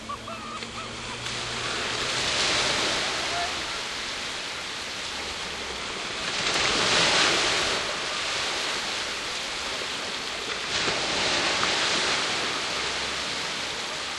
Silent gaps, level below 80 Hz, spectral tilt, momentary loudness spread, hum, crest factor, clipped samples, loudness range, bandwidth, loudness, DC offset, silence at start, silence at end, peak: none; -52 dBFS; -1 dB/octave; 9 LU; none; 18 dB; under 0.1%; 5 LU; 13 kHz; -26 LUFS; under 0.1%; 0 s; 0 s; -10 dBFS